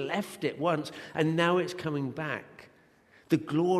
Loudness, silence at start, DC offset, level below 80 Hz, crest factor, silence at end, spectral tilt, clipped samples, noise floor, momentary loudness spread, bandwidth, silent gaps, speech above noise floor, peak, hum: -30 LUFS; 0 s; under 0.1%; -70 dBFS; 18 dB; 0 s; -6 dB/octave; under 0.1%; -61 dBFS; 9 LU; 13.5 kHz; none; 32 dB; -12 dBFS; none